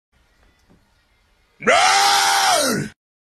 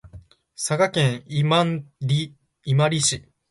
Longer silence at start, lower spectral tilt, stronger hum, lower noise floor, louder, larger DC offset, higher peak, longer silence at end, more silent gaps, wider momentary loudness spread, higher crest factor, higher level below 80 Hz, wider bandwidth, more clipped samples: first, 1.6 s vs 0.05 s; second, -1 dB/octave vs -4.5 dB/octave; neither; first, -60 dBFS vs -47 dBFS; first, -15 LUFS vs -22 LUFS; neither; first, -2 dBFS vs -6 dBFS; about the same, 0.4 s vs 0.3 s; neither; about the same, 11 LU vs 11 LU; about the same, 18 dB vs 16 dB; about the same, -58 dBFS vs -56 dBFS; first, 14 kHz vs 11.5 kHz; neither